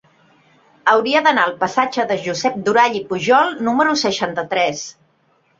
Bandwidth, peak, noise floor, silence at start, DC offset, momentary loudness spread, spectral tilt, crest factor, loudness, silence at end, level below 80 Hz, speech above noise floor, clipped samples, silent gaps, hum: 7.8 kHz; -2 dBFS; -60 dBFS; 0.85 s; under 0.1%; 7 LU; -3.5 dB/octave; 16 dB; -17 LUFS; 0.7 s; -62 dBFS; 43 dB; under 0.1%; none; none